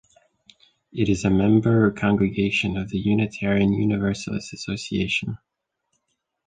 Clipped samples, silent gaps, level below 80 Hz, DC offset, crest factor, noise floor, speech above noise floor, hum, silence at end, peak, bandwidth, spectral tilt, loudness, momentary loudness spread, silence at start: under 0.1%; none; -46 dBFS; under 0.1%; 16 dB; -75 dBFS; 53 dB; none; 1.1 s; -6 dBFS; 9.4 kHz; -6.5 dB/octave; -22 LUFS; 12 LU; 0.95 s